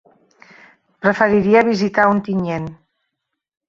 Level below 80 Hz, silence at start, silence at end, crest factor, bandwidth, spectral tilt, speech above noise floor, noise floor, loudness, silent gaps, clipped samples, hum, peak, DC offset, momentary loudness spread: -54 dBFS; 1.05 s; 0.95 s; 18 dB; 7.2 kHz; -7 dB/octave; 63 dB; -78 dBFS; -16 LUFS; none; under 0.1%; none; 0 dBFS; under 0.1%; 11 LU